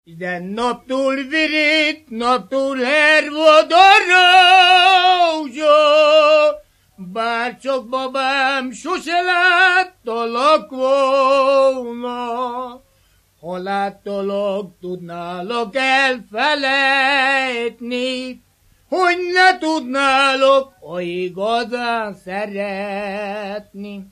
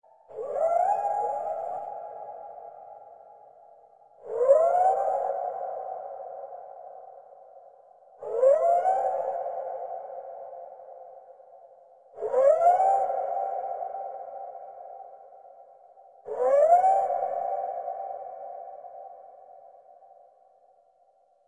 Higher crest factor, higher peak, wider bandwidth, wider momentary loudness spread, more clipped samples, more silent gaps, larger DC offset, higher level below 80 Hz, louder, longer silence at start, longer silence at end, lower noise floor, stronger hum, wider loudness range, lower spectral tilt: about the same, 16 dB vs 20 dB; first, 0 dBFS vs -8 dBFS; first, 12.5 kHz vs 9.2 kHz; second, 16 LU vs 25 LU; neither; neither; neither; first, -60 dBFS vs -82 dBFS; first, -15 LUFS vs -26 LUFS; second, 0.1 s vs 0.3 s; second, 0.1 s vs 1.8 s; second, -57 dBFS vs -64 dBFS; neither; about the same, 11 LU vs 11 LU; second, -3 dB/octave vs -4.5 dB/octave